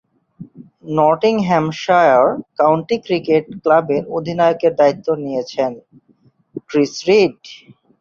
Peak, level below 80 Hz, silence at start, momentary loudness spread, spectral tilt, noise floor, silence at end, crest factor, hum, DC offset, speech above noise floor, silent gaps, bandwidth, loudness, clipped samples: 0 dBFS; -60 dBFS; 0.4 s; 9 LU; -6 dB/octave; -56 dBFS; 0.45 s; 16 dB; none; under 0.1%; 40 dB; none; 7.4 kHz; -16 LUFS; under 0.1%